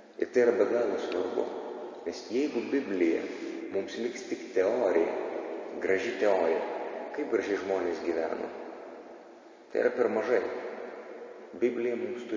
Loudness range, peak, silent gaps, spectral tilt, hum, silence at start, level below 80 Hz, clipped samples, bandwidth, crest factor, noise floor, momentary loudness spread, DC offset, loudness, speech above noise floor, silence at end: 3 LU; -12 dBFS; none; -5 dB/octave; none; 0 s; -72 dBFS; under 0.1%; 7.4 kHz; 18 dB; -52 dBFS; 15 LU; under 0.1%; -30 LUFS; 22 dB; 0 s